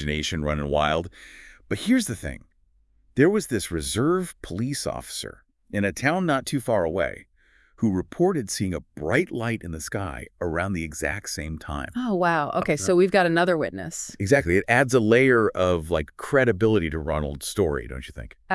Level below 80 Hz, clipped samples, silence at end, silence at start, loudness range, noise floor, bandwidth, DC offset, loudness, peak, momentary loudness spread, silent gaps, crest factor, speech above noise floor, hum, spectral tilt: -44 dBFS; under 0.1%; 0 s; 0 s; 6 LU; -63 dBFS; 12 kHz; under 0.1%; -24 LUFS; -4 dBFS; 13 LU; none; 20 dB; 39 dB; none; -5 dB/octave